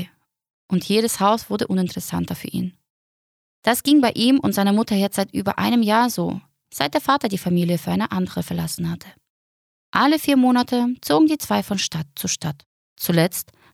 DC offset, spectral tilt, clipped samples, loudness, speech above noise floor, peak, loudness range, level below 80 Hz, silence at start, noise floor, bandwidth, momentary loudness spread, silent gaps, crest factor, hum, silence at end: under 0.1%; -5 dB/octave; under 0.1%; -20 LUFS; 20 dB; -4 dBFS; 4 LU; -56 dBFS; 0 s; -40 dBFS; 17.5 kHz; 11 LU; 0.50-0.69 s, 2.90-3.62 s, 9.30-9.93 s, 12.66-12.96 s; 18 dB; none; 0.3 s